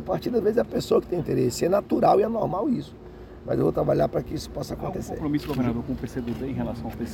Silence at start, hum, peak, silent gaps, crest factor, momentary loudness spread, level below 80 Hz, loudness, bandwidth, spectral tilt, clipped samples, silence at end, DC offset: 0 s; none; -8 dBFS; none; 18 dB; 11 LU; -44 dBFS; -25 LUFS; 17 kHz; -7 dB/octave; under 0.1%; 0 s; under 0.1%